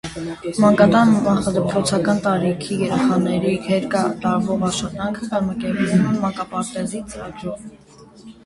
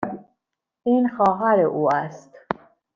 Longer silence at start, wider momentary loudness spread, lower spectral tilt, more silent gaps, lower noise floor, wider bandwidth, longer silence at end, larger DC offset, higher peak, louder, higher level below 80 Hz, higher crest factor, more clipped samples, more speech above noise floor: about the same, 0.05 s vs 0 s; about the same, 14 LU vs 13 LU; second, -6 dB/octave vs -8 dB/octave; neither; second, -43 dBFS vs -79 dBFS; first, 11.5 kHz vs 7.2 kHz; second, 0.15 s vs 0.4 s; neither; first, 0 dBFS vs -4 dBFS; about the same, -19 LUFS vs -21 LUFS; first, -48 dBFS vs -66 dBFS; about the same, 18 dB vs 20 dB; neither; second, 24 dB vs 59 dB